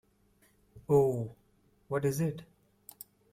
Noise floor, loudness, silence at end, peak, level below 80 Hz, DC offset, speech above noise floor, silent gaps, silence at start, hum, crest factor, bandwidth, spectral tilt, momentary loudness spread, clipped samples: -68 dBFS; -31 LUFS; 0.9 s; -14 dBFS; -64 dBFS; under 0.1%; 39 dB; none; 0.75 s; none; 20 dB; 16 kHz; -7.5 dB/octave; 23 LU; under 0.1%